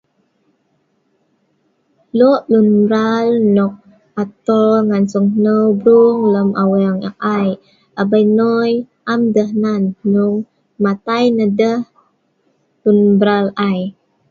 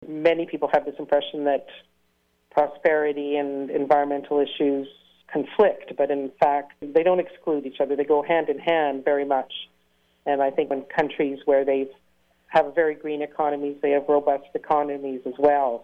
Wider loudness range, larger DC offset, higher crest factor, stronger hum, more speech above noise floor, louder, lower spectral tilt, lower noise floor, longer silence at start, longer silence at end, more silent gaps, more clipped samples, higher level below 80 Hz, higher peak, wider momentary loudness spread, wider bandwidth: about the same, 3 LU vs 2 LU; neither; about the same, 14 dB vs 16 dB; neither; first, 50 dB vs 45 dB; first, -14 LUFS vs -23 LUFS; about the same, -8 dB/octave vs -7 dB/octave; second, -62 dBFS vs -68 dBFS; first, 2.15 s vs 0 s; first, 0.4 s vs 0 s; neither; neither; about the same, -60 dBFS vs -64 dBFS; first, 0 dBFS vs -8 dBFS; about the same, 10 LU vs 8 LU; first, 7.2 kHz vs 5.6 kHz